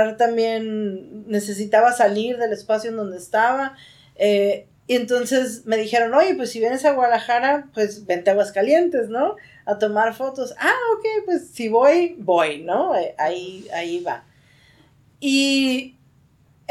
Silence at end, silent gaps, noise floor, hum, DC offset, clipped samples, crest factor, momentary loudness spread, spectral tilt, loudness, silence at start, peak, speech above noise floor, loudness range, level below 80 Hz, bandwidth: 0.8 s; none; -56 dBFS; none; under 0.1%; under 0.1%; 16 dB; 11 LU; -4 dB/octave; -20 LUFS; 0 s; -4 dBFS; 36 dB; 4 LU; -68 dBFS; 15.5 kHz